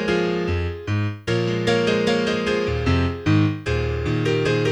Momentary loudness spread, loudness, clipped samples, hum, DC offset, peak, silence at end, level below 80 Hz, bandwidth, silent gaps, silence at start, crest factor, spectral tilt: 5 LU; -21 LUFS; under 0.1%; none; under 0.1%; -6 dBFS; 0 s; -36 dBFS; 11 kHz; none; 0 s; 16 dB; -6.5 dB/octave